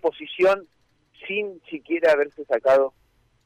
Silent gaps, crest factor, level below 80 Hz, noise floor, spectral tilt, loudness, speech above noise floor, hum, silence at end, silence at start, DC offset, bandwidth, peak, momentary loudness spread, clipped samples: none; 12 dB; -64 dBFS; -54 dBFS; -5 dB/octave; -22 LUFS; 32 dB; none; 0.55 s; 0.05 s; under 0.1%; 10 kHz; -10 dBFS; 11 LU; under 0.1%